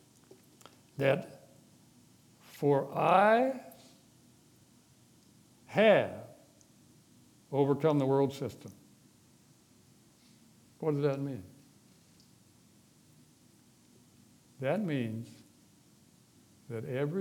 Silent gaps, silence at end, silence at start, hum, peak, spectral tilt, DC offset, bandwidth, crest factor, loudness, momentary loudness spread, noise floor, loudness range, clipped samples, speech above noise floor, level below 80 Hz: none; 0 s; 1 s; none; -10 dBFS; -7 dB/octave; under 0.1%; 18 kHz; 24 dB; -30 LUFS; 25 LU; -63 dBFS; 9 LU; under 0.1%; 34 dB; -80 dBFS